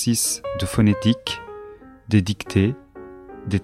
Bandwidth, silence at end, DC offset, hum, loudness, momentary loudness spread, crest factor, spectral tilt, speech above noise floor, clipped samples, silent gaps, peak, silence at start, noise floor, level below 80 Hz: 15.5 kHz; 0 s; under 0.1%; none; -21 LUFS; 21 LU; 18 dB; -5 dB/octave; 21 dB; under 0.1%; none; -4 dBFS; 0 s; -42 dBFS; -46 dBFS